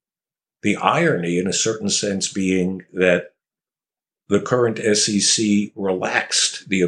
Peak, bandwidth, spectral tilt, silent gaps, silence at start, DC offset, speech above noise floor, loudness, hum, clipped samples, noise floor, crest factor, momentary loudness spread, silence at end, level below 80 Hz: -2 dBFS; 11.5 kHz; -3.5 dB/octave; none; 0.65 s; under 0.1%; over 71 dB; -19 LUFS; none; under 0.1%; under -90 dBFS; 20 dB; 7 LU; 0 s; -64 dBFS